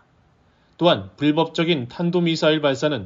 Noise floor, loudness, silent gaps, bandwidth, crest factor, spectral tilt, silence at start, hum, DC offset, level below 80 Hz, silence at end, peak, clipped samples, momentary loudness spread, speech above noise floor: -58 dBFS; -20 LUFS; none; 7.6 kHz; 18 dB; -6 dB/octave; 0.8 s; none; under 0.1%; -62 dBFS; 0 s; -4 dBFS; under 0.1%; 3 LU; 39 dB